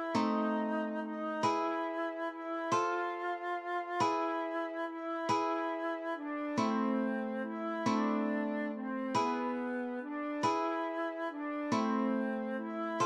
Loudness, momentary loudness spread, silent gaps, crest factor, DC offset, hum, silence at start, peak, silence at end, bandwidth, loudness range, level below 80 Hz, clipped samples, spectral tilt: -35 LUFS; 6 LU; none; 16 dB; under 0.1%; none; 0 s; -18 dBFS; 0 s; 11 kHz; 1 LU; -84 dBFS; under 0.1%; -5.5 dB/octave